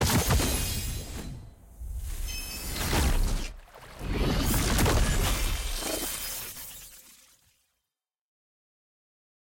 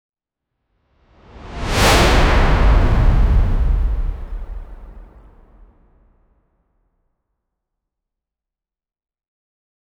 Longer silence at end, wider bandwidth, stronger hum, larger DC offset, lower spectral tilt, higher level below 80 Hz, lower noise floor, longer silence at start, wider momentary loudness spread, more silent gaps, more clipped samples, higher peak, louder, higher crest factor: second, 2.5 s vs 4.95 s; about the same, 17 kHz vs 16.5 kHz; neither; neither; about the same, -4 dB/octave vs -5 dB/octave; second, -32 dBFS vs -20 dBFS; about the same, -87 dBFS vs -88 dBFS; second, 0 s vs 1.45 s; about the same, 19 LU vs 21 LU; neither; neither; second, -14 dBFS vs -2 dBFS; second, -29 LUFS vs -16 LUFS; about the same, 16 dB vs 16 dB